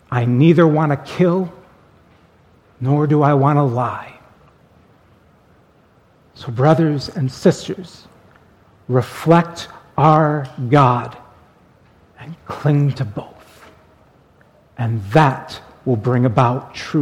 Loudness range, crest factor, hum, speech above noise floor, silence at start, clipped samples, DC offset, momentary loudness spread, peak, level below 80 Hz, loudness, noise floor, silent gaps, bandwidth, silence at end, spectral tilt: 7 LU; 18 dB; none; 37 dB; 0.1 s; under 0.1%; under 0.1%; 18 LU; 0 dBFS; -52 dBFS; -17 LUFS; -53 dBFS; none; 12 kHz; 0 s; -8 dB/octave